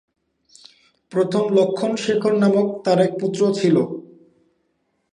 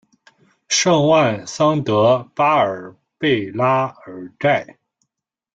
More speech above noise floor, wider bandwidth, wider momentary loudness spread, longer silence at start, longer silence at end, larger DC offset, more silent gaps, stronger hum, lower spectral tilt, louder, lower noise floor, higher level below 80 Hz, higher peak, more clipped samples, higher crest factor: second, 51 dB vs 63 dB; first, 10.5 kHz vs 9.2 kHz; second, 6 LU vs 9 LU; first, 1.1 s vs 0.7 s; first, 1.1 s vs 0.9 s; neither; neither; neither; first, -6.5 dB/octave vs -4.5 dB/octave; about the same, -19 LUFS vs -17 LUFS; second, -69 dBFS vs -81 dBFS; second, -68 dBFS vs -60 dBFS; about the same, -4 dBFS vs -2 dBFS; neither; about the same, 18 dB vs 16 dB